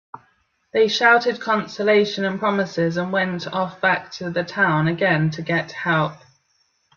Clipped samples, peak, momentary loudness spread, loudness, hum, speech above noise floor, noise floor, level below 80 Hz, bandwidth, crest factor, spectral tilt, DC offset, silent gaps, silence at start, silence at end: under 0.1%; -4 dBFS; 9 LU; -20 LUFS; none; 46 dB; -66 dBFS; -62 dBFS; 7.2 kHz; 18 dB; -6 dB/octave; under 0.1%; none; 0.15 s; 0.8 s